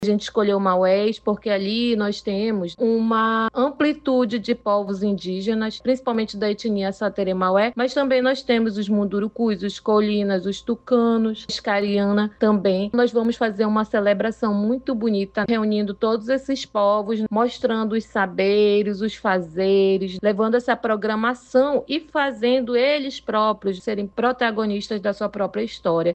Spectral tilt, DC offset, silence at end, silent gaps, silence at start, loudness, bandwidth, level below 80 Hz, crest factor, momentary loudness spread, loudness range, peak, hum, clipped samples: -6 dB/octave; under 0.1%; 0 s; none; 0 s; -21 LUFS; 8.4 kHz; -56 dBFS; 14 dB; 5 LU; 2 LU; -6 dBFS; none; under 0.1%